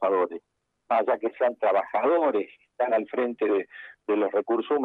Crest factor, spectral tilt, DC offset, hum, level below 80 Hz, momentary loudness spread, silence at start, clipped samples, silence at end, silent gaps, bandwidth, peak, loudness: 14 dB; -7.5 dB/octave; under 0.1%; none; -80 dBFS; 8 LU; 0 s; under 0.1%; 0 s; none; 4.4 kHz; -12 dBFS; -26 LUFS